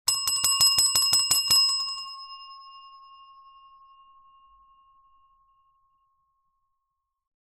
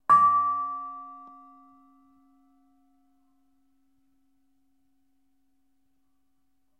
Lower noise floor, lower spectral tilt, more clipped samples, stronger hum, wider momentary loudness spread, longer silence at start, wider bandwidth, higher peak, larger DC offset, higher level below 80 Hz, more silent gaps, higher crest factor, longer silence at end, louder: first, -82 dBFS vs -77 dBFS; second, 2.5 dB/octave vs -5 dB/octave; neither; neither; second, 23 LU vs 26 LU; about the same, 0.05 s vs 0.1 s; first, 15.5 kHz vs 9.4 kHz; about the same, -8 dBFS vs -10 dBFS; neither; first, -64 dBFS vs -82 dBFS; neither; about the same, 22 dB vs 22 dB; second, 4.65 s vs 5.55 s; first, -20 LUFS vs -23 LUFS